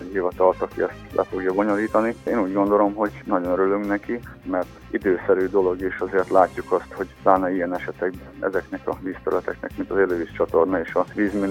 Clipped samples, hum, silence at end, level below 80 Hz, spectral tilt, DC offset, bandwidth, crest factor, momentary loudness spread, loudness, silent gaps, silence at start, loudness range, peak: under 0.1%; none; 0 s; -48 dBFS; -7.5 dB/octave; under 0.1%; 16.5 kHz; 20 dB; 9 LU; -23 LUFS; none; 0 s; 3 LU; -2 dBFS